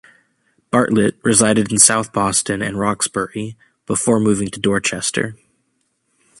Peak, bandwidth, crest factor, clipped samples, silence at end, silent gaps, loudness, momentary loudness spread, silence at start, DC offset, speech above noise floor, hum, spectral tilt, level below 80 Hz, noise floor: 0 dBFS; 13.5 kHz; 18 dB; under 0.1%; 1.05 s; none; -16 LUFS; 12 LU; 0.75 s; under 0.1%; 50 dB; none; -3.5 dB/octave; -50 dBFS; -67 dBFS